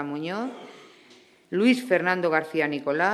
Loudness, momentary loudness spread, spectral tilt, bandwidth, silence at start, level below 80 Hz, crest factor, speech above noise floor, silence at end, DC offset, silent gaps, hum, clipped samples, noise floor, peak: -25 LUFS; 13 LU; -5.5 dB/octave; 13.5 kHz; 0 s; -78 dBFS; 18 dB; 30 dB; 0 s; under 0.1%; none; none; under 0.1%; -55 dBFS; -8 dBFS